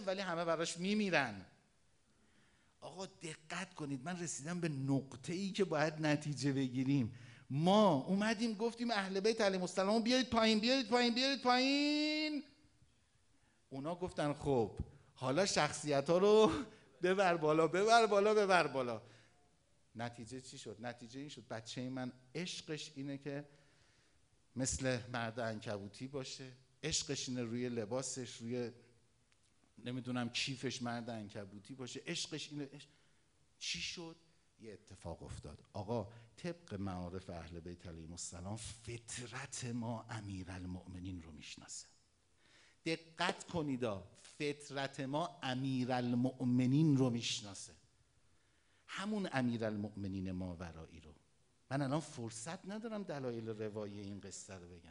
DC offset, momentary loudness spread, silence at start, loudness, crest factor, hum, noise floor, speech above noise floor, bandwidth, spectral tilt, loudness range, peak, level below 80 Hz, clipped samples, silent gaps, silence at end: under 0.1%; 18 LU; 0 s; -38 LUFS; 24 dB; none; -75 dBFS; 37 dB; 10.5 kHz; -4.5 dB/octave; 13 LU; -14 dBFS; -66 dBFS; under 0.1%; none; 0 s